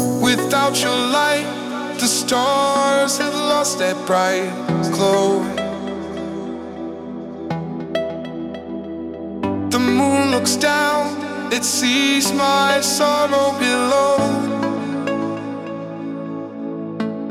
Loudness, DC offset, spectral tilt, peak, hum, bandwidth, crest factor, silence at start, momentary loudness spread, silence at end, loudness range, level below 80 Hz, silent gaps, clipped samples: -18 LUFS; under 0.1%; -3.5 dB/octave; -4 dBFS; none; 16.5 kHz; 14 dB; 0 s; 13 LU; 0 s; 9 LU; -56 dBFS; none; under 0.1%